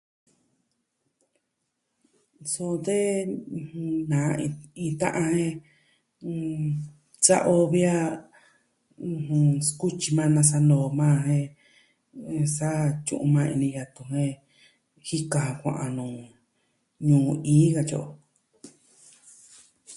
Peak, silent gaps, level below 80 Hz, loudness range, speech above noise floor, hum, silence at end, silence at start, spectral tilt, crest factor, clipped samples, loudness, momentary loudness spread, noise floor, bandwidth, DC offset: -4 dBFS; none; -64 dBFS; 7 LU; 54 dB; none; 0 s; 2.4 s; -6 dB/octave; 22 dB; under 0.1%; -25 LUFS; 16 LU; -79 dBFS; 11.5 kHz; under 0.1%